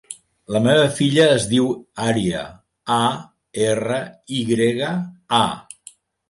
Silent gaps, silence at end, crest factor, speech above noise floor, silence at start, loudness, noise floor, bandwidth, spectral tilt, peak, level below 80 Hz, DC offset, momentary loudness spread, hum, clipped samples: none; 0.7 s; 16 dB; 29 dB; 0.1 s; -19 LUFS; -48 dBFS; 11.5 kHz; -5 dB/octave; -4 dBFS; -54 dBFS; under 0.1%; 19 LU; none; under 0.1%